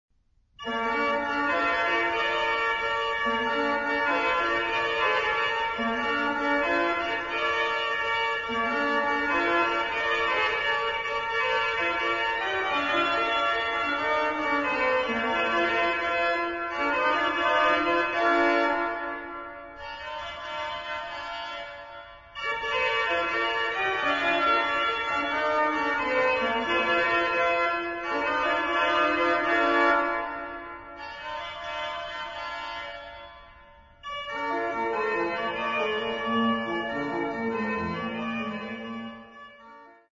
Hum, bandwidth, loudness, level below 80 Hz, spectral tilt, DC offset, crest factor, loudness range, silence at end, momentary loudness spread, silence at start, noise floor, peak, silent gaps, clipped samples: none; 7.6 kHz; -26 LUFS; -56 dBFS; -4 dB/octave; under 0.1%; 16 dB; 8 LU; 0.2 s; 13 LU; 0.6 s; -64 dBFS; -10 dBFS; none; under 0.1%